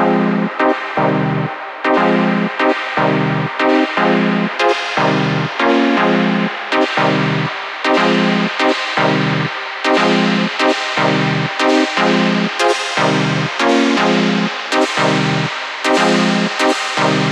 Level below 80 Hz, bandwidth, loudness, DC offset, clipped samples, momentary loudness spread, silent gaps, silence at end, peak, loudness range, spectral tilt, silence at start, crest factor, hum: -60 dBFS; 12 kHz; -15 LUFS; under 0.1%; under 0.1%; 4 LU; none; 0 s; -2 dBFS; 1 LU; -5 dB/octave; 0 s; 14 dB; none